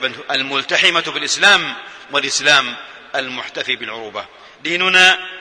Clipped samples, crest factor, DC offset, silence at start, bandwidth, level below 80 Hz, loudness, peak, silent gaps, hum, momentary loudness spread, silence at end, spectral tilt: under 0.1%; 18 dB; under 0.1%; 0 s; 11 kHz; -64 dBFS; -14 LUFS; 0 dBFS; none; none; 17 LU; 0 s; -0.5 dB/octave